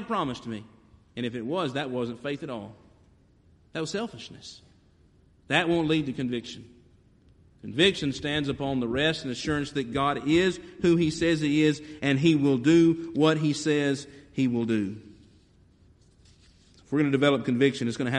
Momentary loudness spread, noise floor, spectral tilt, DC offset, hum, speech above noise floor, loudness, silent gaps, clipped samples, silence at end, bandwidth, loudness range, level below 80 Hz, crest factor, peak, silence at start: 15 LU; -60 dBFS; -5.5 dB/octave; under 0.1%; none; 34 dB; -26 LUFS; none; under 0.1%; 0 s; 10.5 kHz; 10 LU; -56 dBFS; 20 dB; -8 dBFS; 0 s